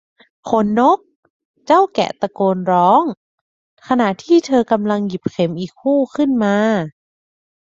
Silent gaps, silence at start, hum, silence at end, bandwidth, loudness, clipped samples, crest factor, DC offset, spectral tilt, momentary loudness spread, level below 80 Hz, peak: 1.16-1.23 s, 1.30-1.54 s, 3.17-3.77 s; 0.45 s; none; 0.85 s; 7.8 kHz; -16 LUFS; under 0.1%; 16 dB; under 0.1%; -6.5 dB/octave; 8 LU; -58 dBFS; 0 dBFS